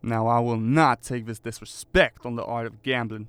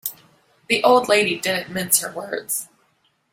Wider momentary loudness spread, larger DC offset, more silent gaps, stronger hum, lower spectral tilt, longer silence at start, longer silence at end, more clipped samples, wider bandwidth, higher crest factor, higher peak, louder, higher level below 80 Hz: about the same, 14 LU vs 12 LU; neither; neither; neither; first, -6 dB/octave vs -2 dB/octave; about the same, 0.05 s vs 0.05 s; second, 0 s vs 0.7 s; neither; about the same, 16 kHz vs 16.5 kHz; about the same, 20 dB vs 22 dB; second, -4 dBFS vs 0 dBFS; second, -24 LUFS vs -19 LUFS; first, -44 dBFS vs -64 dBFS